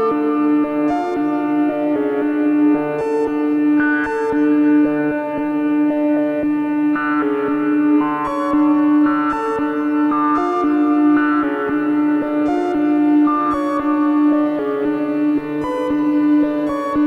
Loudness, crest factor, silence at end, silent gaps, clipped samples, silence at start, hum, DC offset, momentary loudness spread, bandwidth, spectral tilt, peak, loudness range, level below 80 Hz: -17 LUFS; 10 dB; 0 s; none; under 0.1%; 0 s; none; under 0.1%; 5 LU; 4.7 kHz; -7.5 dB/octave; -6 dBFS; 1 LU; -52 dBFS